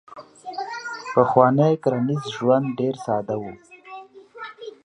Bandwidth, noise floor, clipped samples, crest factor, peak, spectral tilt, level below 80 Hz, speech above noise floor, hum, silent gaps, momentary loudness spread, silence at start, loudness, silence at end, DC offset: 10.5 kHz; -42 dBFS; under 0.1%; 22 dB; -2 dBFS; -7.5 dB/octave; -64 dBFS; 22 dB; none; none; 23 LU; 0.1 s; -21 LUFS; 0.15 s; under 0.1%